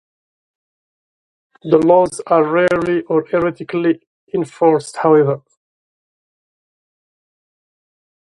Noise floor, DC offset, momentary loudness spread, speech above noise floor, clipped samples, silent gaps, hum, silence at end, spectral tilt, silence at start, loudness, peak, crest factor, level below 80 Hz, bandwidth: under -90 dBFS; under 0.1%; 10 LU; over 75 dB; under 0.1%; 4.07-4.27 s; none; 3 s; -6.5 dB/octave; 1.65 s; -16 LUFS; 0 dBFS; 18 dB; -56 dBFS; 11.5 kHz